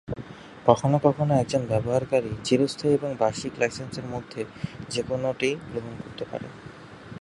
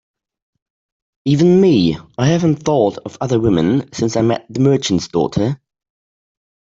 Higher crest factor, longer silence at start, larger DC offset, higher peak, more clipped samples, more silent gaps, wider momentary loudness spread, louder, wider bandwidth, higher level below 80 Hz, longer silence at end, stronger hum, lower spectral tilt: first, 26 dB vs 14 dB; second, 0.1 s vs 1.25 s; neither; about the same, 0 dBFS vs -2 dBFS; neither; neither; first, 15 LU vs 8 LU; second, -26 LUFS vs -16 LUFS; first, 11.5 kHz vs 7.8 kHz; second, -54 dBFS vs -48 dBFS; second, 0.05 s vs 1.15 s; neither; about the same, -6 dB/octave vs -6.5 dB/octave